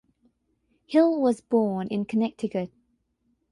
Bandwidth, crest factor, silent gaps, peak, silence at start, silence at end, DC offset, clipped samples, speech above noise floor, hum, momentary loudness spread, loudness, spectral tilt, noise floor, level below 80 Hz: 11 kHz; 18 dB; none; -8 dBFS; 0.9 s; 0.85 s; under 0.1%; under 0.1%; 48 dB; none; 9 LU; -25 LUFS; -7.5 dB/octave; -72 dBFS; -68 dBFS